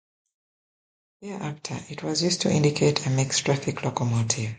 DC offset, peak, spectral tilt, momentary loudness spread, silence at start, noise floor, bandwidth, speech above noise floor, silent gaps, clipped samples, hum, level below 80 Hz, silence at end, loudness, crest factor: under 0.1%; -6 dBFS; -4.5 dB/octave; 13 LU; 1.2 s; under -90 dBFS; 9.6 kHz; over 65 dB; none; under 0.1%; none; -58 dBFS; 0 s; -25 LUFS; 20 dB